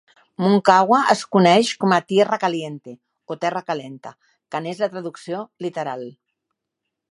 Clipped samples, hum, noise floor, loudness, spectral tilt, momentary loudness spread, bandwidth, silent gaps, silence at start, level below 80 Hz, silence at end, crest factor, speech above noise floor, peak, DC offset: under 0.1%; none; -81 dBFS; -19 LUFS; -5.5 dB/octave; 18 LU; 11 kHz; none; 0.4 s; -70 dBFS; 1 s; 20 dB; 61 dB; 0 dBFS; under 0.1%